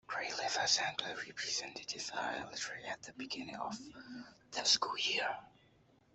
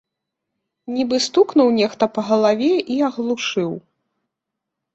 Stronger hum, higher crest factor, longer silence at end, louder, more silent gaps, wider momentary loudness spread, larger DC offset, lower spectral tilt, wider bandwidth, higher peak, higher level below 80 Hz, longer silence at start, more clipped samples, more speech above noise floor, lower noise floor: neither; first, 22 dB vs 16 dB; second, 0.65 s vs 1.15 s; second, -36 LUFS vs -18 LUFS; neither; first, 16 LU vs 9 LU; neither; second, -0.5 dB/octave vs -4.5 dB/octave; about the same, 8.2 kHz vs 8.2 kHz; second, -16 dBFS vs -4 dBFS; second, -76 dBFS vs -64 dBFS; second, 0.1 s vs 0.9 s; neither; second, 29 dB vs 64 dB; second, -68 dBFS vs -82 dBFS